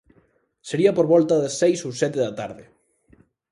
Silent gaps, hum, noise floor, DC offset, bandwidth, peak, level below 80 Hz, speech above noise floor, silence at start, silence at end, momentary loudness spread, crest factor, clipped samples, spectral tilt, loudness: none; none; -62 dBFS; under 0.1%; 11.5 kHz; -4 dBFS; -64 dBFS; 42 dB; 0.65 s; 0.9 s; 16 LU; 18 dB; under 0.1%; -5.5 dB/octave; -21 LUFS